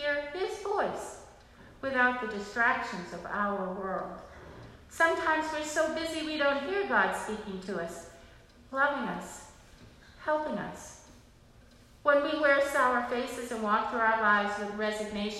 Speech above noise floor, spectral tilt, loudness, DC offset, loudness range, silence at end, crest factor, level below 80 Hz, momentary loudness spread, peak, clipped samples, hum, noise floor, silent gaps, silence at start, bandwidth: 27 dB; -4 dB/octave; -30 LUFS; under 0.1%; 7 LU; 0 s; 20 dB; -60 dBFS; 19 LU; -12 dBFS; under 0.1%; none; -57 dBFS; none; 0 s; 14 kHz